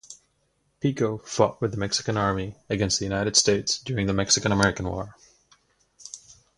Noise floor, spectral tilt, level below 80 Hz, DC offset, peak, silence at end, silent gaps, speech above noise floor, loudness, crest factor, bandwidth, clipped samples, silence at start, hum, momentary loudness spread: -70 dBFS; -3.5 dB/octave; -48 dBFS; under 0.1%; -4 dBFS; 0.4 s; none; 46 dB; -24 LUFS; 24 dB; 11.5 kHz; under 0.1%; 0.1 s; none; 16 LU